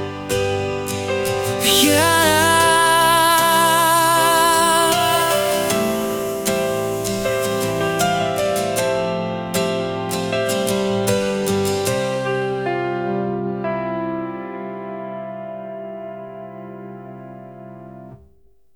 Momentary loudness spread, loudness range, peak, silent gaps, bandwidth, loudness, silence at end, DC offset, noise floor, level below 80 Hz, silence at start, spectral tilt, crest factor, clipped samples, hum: 19 LU; 17 LU; -2 dBFS; none; over 20 kHz; -18 LUFS; 0.6 s; under 0.1%; -56 dBFS; -50 dBFS; 0 s; -3 dB/octave; 18 dB; under 0.1%; none